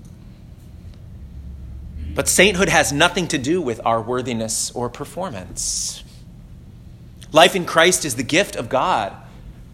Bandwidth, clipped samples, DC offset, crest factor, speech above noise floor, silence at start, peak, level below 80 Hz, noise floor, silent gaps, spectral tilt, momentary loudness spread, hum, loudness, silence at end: 16.5 kHz; under 0.1%; under 0.1%; 20 dB; 22 dB; 0 s; 0 dBFS; -40 dBFS; -40 dBFS; none; -3 dB/octave; 23 LU; none; -18 LUFS; 0 s